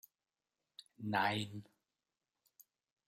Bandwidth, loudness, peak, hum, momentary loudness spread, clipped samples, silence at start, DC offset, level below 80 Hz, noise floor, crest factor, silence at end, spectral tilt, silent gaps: 16 kHz; -38 LUFS; -20 dBFS; none; 24 LU; under 0.1%; 0.8 s; under 0.1%; -82 dBFS; under -90 dBFS; 24 dB; 1.45 s; -5 dB/octave; none